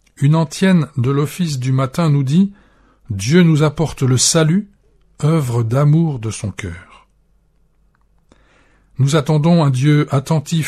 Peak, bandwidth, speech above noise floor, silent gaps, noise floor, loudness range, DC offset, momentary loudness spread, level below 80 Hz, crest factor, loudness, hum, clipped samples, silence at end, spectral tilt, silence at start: -2 dBFS; 14 kHz; 42 dB; none; -56 dBFS; 7 LU; under 0.1%; 11 LU; -48 dBFS; 14 dB; -15 LUFS; none; under 0.1%; 0 s; -6 dB/octave; 0.2 s